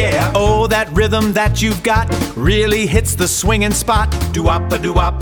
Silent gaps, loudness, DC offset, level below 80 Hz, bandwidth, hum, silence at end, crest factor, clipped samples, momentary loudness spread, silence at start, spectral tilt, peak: none; -15 LUFS; 0.3%; -22 dBFS; 19.5 kHz; none; 0 s; 14 dB; under 0.1%; 3 LU; 0 s; -4.5 dB/octave; 0 dBFS